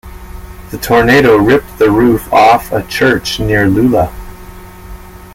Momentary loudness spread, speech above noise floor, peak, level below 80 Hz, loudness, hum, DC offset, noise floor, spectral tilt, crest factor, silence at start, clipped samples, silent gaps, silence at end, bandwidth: 20 LU; 22 dB; 0 dBFS; -30 dBFS; -10 LUFS; none; under 0.1%; -31 dBFS; -5.5 dB/octave; 12 dB; 0.05 s; under 0.1%; none; 0.1 s; 17 kHz